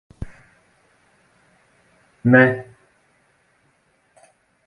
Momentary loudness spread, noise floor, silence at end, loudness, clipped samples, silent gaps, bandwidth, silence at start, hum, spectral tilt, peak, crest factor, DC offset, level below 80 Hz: 25 LU; -63 dBFS; 2.05 s; -16 LUFS; under 0.1%; none; 9.6 kHz; 0.2 s; none; -9 dB/octave; 0 dBFS; 24 dB; under 0.1%; -50 dBFS